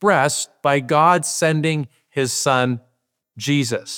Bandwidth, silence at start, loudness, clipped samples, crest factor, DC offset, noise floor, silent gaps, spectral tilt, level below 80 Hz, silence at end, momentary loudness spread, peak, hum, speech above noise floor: 19.5 kHz; 0 s; -19 LUFS; under 0.1%; 18 dB; under 0.1%; -70 dBFS; none; -4 dB/octave; -70 dBFS; 0 s; 10 LU; -2 dBFS; none; 51 dB